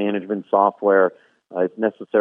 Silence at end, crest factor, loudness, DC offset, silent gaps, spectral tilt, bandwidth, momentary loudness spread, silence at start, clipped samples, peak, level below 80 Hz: 0 s; 18 dB; -20 LUFS; under 0.1%; none; -9.5 dB/octave; 3.7 kHz; 8 LU; 0 s; under 0.1%; -2 dBFS; -74 dBFS